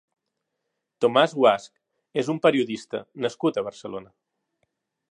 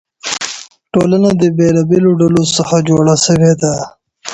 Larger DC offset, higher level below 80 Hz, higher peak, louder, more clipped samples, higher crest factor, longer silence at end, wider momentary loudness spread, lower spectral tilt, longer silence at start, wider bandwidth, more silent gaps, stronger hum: neither; second, -74 dBFS vs -44 dBFS; second, -4 dBFS vs 0 dBFS; second, -23 LUFS vs -12 LUFS; neither; first, 20 dB vs 12 dB; first, 1.05 s vs 0 s; first, 15 LU vs 12 LU; about the same, -5.5 dB/octave vs -5.5 dB/octave; first, 1 s vs 0.25 s; about the same, 10.5 kHz vs 10.5 kHz; neither; neither